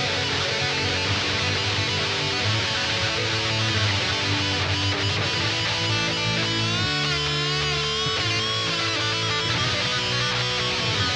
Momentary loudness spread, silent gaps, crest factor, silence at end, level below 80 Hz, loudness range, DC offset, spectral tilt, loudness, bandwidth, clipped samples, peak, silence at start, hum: 1 LU; none; 16 dB; 0 s; -46 dBFS; 0 LU; under 0.1%; -3 dB/octave; -22 LUFS; 10.5 kHz; under 0.1%; -8 dBFS; 0 s; none